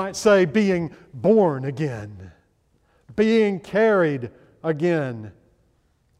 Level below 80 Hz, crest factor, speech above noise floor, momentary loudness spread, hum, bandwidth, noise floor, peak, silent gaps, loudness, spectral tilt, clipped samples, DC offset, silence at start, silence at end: -58 dBFS; 16 dB; 43 dB; 16 LU; none; 13 kHz; -64 dBFS; -6 dBFS; none; -21 LUFS; -6.5 dB/octave; under 0.1%; under 0.1%; 0 s; 0.9 s